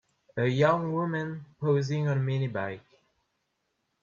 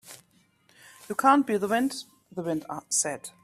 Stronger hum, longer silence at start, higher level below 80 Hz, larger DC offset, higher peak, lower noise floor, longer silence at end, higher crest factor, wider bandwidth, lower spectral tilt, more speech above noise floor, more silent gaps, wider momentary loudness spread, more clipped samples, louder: neither; first, 0.35 s vs 0.05 s; about the same, -68 dBFS vs -72 dBFS; neither; second, -10 dBFS vs -6 dBFS; first, -78 dBFS vs -64 dBFS; first, 1.25 s vs 0.15 s; about the same, 18 dB vs 22 dB; second, 7.2 kHz vs 15 kHz; first, -7.5 dB/octave vs -3 dB/octave; first, 51 dB vs 38 dB; neither; second, 13 LU vs 17 LU; neither; about the same, -28 LUFS vs -26 LUFS